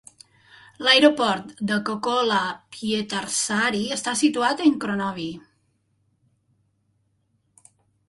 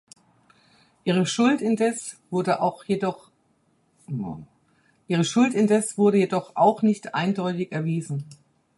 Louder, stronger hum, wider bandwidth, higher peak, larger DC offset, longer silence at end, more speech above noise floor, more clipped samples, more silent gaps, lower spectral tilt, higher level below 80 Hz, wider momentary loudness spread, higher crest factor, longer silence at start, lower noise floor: about the same, -22 LUFS vs -24 LUFS; neither; about the same, 11.5 kHz vs 11.5 kHz; first, -2 dBFS vs -6 dBFS; neither; first, 2.7 s vs 0.45 s; first, 47 dB vs 43 dB; neither; neither; second, -3 dB/octave vs -5.5 dB/octave; about the same, -64 dBFS vs -68 dBFS; about the same, 13 LU vs 13 LU; about the same, 22 dB vs 18 dB; second, 0.8 s vs 1.05 s; about the same, -69 dBFS vs -66 dBFS